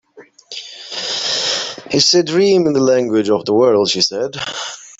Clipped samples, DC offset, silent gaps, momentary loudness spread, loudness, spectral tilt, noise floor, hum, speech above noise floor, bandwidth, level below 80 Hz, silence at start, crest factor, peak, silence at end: under 0.1%; under 0.1%; none; 14 LU; -15 LUFS; -3.5 dB/octave; -41 dBFS; none; 27 dB; 8 kHz; -58 dBFS; 0.15 s; 16 dB; 0 dBFS; 0.1 s